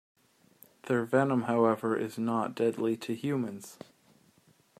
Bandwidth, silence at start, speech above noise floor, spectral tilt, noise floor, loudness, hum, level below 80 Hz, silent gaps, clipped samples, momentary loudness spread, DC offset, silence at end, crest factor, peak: 15 kHz; 0.85 s; 35 dB; -7 dB/octave; -65 dBFS; -30 LUFS; none; -76 dBFS; none; under 0.1%; 17 LU; under 0.1%; 1.05 s; 20 dB; -12 dBFS